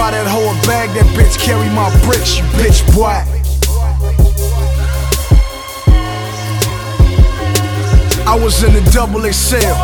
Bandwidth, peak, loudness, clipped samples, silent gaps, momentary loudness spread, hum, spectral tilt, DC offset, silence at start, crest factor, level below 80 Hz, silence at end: 19.5 kHz; 0 dBFS; -12 LUFS; under 0.1%; none; 6 LU; none; -5 dB/octave; under 0.1%; 0 s; 10 dB; -14 dBFS; 0 s